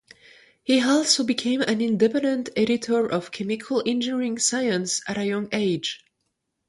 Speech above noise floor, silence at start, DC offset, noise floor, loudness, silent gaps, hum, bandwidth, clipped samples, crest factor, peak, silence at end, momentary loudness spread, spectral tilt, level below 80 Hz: 54 dB; 0.7 s; under 0.1%; -77 dBFS; -23 LUFS; none; none; 11.5 kHz; under 0.1%; 18 dB; -6 dBFS; 0.75 s; 8 LU; -3.5 dB/octave; -66 dBFS